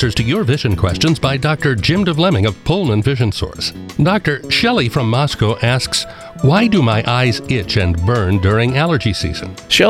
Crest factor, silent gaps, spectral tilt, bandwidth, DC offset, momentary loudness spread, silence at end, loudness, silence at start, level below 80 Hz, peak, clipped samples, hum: 14 dB; none; -5.5 dB/octave; 15 kHz; under 0.1%; 5 LU; 0 s; -15 LUFS; 0 s; -34 dBFS; 0 dBFS; under 0.1%; none